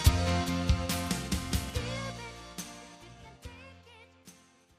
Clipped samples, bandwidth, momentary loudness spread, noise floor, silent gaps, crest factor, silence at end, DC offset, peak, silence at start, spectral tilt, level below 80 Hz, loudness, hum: under 0.1%; 15.5 kHz; 22 LU; -58 dBFS; none; 24 dB; 0.5 s; under 0.1%; -10 dBFS; 0 s; -4.5 dB/octave; -38 dBFS; -33 LUFS; none